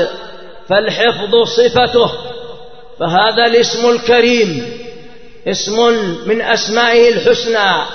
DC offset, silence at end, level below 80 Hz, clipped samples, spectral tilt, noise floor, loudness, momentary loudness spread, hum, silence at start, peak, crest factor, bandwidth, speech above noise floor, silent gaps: 2%; 0 s; -46 dBFS; under 0.1%; -3.5 dB/octave; -37 dBFS; -12 LUFS; 17 LU; none; 0 s; 0 dBFS; 14 dB; 6.6 kHz; 25 dB; none